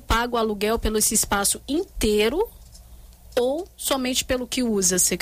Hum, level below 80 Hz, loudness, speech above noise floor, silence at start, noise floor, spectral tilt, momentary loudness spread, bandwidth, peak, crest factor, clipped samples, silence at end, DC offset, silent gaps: none; -38 dBFS; -22 LUFS; 23 dB; 0 s; -45 dBFS; -2.5 dB/octave; 8 LU; 16 kHz; -8 dBFS; 14 dB; under 0.1%; 0 s; under 0.1%; none